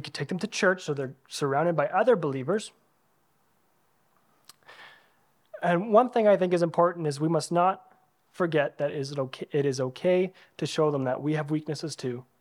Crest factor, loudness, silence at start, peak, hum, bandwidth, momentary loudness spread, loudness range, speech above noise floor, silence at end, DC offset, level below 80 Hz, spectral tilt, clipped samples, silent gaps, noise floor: 20 dB; -27 LUFS; 0 s; -8 dBFS; none; 15 kHz; 11 LU; 6 LU; 43 dB; 0.2 s; under 0.1%; -80 dBFS; -6 dB/octave; under 0.1%; none; -70 dBFS